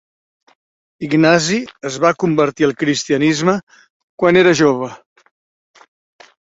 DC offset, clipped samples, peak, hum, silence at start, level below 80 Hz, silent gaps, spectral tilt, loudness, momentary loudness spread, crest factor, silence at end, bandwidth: under 0.1%; under 0.1%; 0 dBFS; none; 1 s; -56 dBFS; 3.63-3.67 s, 3.90-4.18 s; -5 dB/octave; -15 LUFS; 11 LU; 16 dB; 1.5 s; 8 kHz